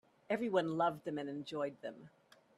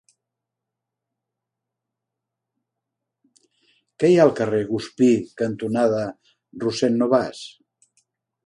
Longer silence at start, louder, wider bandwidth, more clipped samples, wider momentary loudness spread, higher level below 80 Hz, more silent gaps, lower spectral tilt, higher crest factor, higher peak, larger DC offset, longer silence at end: second, 0.3 s vs 4 s; second, -38 LUFS vs -21 LUFS; first, 13 kHz vs 11 kHz; neither; about the same, 15 LU vs 13 LU; second, -82 dBFS vs -64 dBFS; neither; about the same, -6.5 dB/octave vs -6.5 dB/octave; about the same, 20 dB vs 22 dB; second, -20 dBFS vs -2 dBFS; neither; second, 0.5 s vs 0.95 s